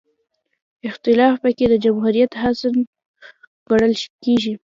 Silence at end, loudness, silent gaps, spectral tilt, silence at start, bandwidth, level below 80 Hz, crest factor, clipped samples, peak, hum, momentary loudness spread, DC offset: 0.1 s; -18 LUFS; 2.87-2.93 s, 3.06-3.14 s, 3.47-3.66 s, 4.10-4.19 s; -6 dB/octave; 0.85 s; 7.6 kHz; -50 dBFS; 16 dB; under 0.1%; -2 dBFS; none; 9 LU; under 0.1%